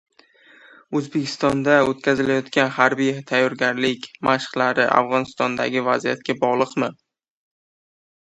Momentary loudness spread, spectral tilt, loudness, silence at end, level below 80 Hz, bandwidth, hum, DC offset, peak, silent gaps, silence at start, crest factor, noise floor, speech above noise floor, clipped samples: 7 LU; -5 dB/octave; -20 LUFS; 1.4 s; -60 dBFS; 11 kHz; none; under 0.1%; 0 dBFS; none; 0.9 s; 22 dB; -52 dBFS; 32 dB; under 0.1%